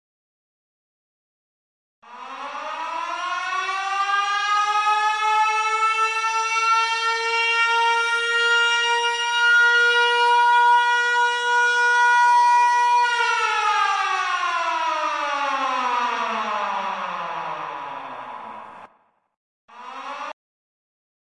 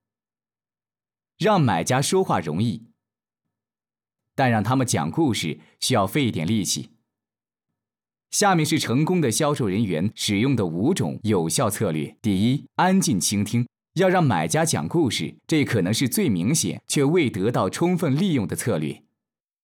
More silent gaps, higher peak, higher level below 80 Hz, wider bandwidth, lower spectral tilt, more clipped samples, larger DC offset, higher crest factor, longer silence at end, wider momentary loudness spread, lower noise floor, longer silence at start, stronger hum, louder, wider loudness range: first, 19.37-19.68 s vs none; about the same, -10 dBFS vs -10 dBFS; about the same, -76 dBFS vs -72 dBFS; second, 11.5 kHz vs 19 kHz; second, 1 dB/octave vs -5 dB/octave; neither; neither; about the same, 12 dB vs 12 dB; first, 1 s vs 0.65 s; first, 17 LU vs 6 LU; second, -61 dBFS vs under -90 dBFS; first, 2.05 s vs 1.4 s; neither; first, -19 LUFS vs -22 LUFS; first, 16 LU vs 3 LU